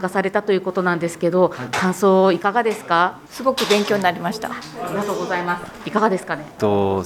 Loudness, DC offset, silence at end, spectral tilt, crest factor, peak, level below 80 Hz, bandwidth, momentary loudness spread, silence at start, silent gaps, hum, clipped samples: -20 LUFS; under 0.1%; 0 s; -5 dB/octave; 16 dB; -4 dBFS; -58 dBFS; 16.5 kHz; 9 LU; 0 s; none; none; under 0.1%